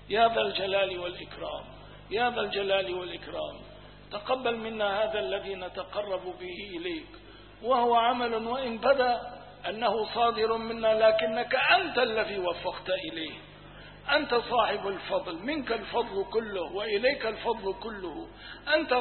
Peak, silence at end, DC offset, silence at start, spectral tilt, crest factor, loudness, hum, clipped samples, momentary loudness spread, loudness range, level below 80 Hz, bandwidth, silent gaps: -10 dBFS; 0 s; under 0.1%; 0 s; -8 dB/octave; 18 dB; -29 LUFS; 50 Hz at -55 dBFS; under 0.1%; 15 LU; 6 LU; -56 dBFS; 4.5 kHz; none